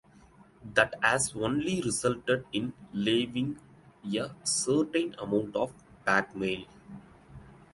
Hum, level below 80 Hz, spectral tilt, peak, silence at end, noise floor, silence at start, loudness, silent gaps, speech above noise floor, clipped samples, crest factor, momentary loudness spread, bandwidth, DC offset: none; -60 dBFS; -3.5 dB/octave; -8 dBFS; 0.2 s; -57 dBFS; 0.6 s; -30 LUFS; none; 28 dB; under 0.1%; 24 dB; 15 LU; 12 kHz; under 0.1%